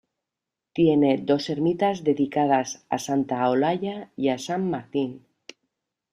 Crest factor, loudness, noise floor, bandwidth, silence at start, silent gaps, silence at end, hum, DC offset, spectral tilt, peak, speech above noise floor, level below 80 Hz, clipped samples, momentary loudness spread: 16 dB; -24 LUFS; -87 dBFS; 14 kHz; 0.75 s; none; 0.95 s; none; under 0.1%; -6 dB/octave; -8 dBFS; 63 dB; -64 dBFS; under 0.1%; 8 LU